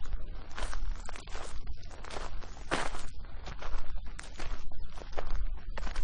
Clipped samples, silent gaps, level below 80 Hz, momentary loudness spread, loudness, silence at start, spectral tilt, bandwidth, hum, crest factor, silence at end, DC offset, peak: under 0.1%; none; -38 dBFS; 11 LU; -42 LUFS; 0 s; -4 dB/octave; 10 kHz; none; 12 dB; 0 s; under 0.1%; -16 dBFS